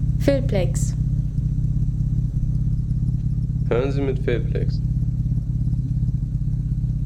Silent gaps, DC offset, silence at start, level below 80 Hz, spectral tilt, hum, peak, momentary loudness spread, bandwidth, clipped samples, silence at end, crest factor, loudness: none; under 0.1%; 0 s; -26 dBFS; -8 dB/octave; none; -4 dBFS; 3 LU; 11.5 kHz; under 0.1%; 0 s; 18 dB; -23 LUFS